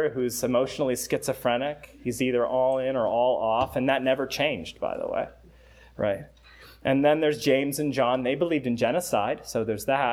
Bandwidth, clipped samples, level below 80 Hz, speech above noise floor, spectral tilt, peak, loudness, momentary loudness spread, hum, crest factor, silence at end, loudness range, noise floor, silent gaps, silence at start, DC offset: 18 kHz; under 0.1%; -56 dBFS; 27 dB; -4.5 dB/octave; -8 dBFS; -26 LUFS; 8 LU; none; 18 dB; 0 s; 3 LU; -52 dBFS; none; 0 s; under 0.1%